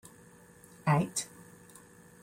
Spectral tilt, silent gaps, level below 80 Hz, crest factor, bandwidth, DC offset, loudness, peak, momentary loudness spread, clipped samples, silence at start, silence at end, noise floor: -5 dB/octave; none; -68 dBFS; 22 dB; 16 kHz; under 0.1%; -31 LUFS; -14 dBFS; 25 LU; under 0.1%; 0.85 s; 0.95 s; -57 dBFS